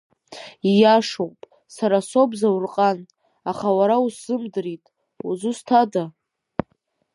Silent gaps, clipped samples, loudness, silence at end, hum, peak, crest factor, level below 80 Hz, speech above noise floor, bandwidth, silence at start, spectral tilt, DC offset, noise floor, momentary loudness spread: none; under 0.1%; -21 LUFS; 1.05 s; none; -2 dBFS; 18 dB; -64 dBFS; 49 dB; 11.5 kHz; 0.3 s; -6 dB/octave; under 0.1%; -69 dBFS; 17 LU